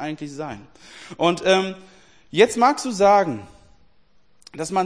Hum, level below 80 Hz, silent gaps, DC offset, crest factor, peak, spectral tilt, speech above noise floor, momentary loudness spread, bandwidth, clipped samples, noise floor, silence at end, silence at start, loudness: none; -58 dBFS; none; 0.2%; 20 dB; -2 dBFS; -4 dB/octave; 41 dB; 23 LU; 10.5 kHz; under 0.1%; -61 dBFS; 0 s; 0 s; -20 LUFS